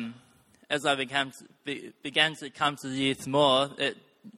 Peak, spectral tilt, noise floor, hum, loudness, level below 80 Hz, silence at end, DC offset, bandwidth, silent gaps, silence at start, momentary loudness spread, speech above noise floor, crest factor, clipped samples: -6 dBFS; -3.5 dB/octave; -61 dBFS; none; -28 LUFS; -70 dBFS; 0.05 s; under 0.1%; 15.5 kHz; none; 0 s; 14 LU; 32 dB; 22 dB; under 0.1%